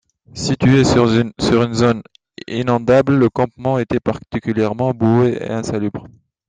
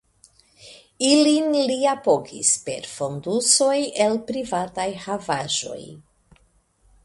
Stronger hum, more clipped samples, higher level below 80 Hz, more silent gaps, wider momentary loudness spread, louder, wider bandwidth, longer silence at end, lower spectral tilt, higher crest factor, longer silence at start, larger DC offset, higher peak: neither; neither; first, -44 dBFS vs -62 dBFS; neither; about the same, 12 LU vs 12 LU; first, -17 LUFS vs -21 LUFS; second, 9.6 kHz vs 11.5 kHz; second, 0.4 s vs 1.05 s; first, -6.5 dB/octave vs -2.5 dB/octave; second, 14 dB vs 20 dB; second, 0.35 s vs 0.65 s; neither; about the same, -2 dBFS vs -4 dBFS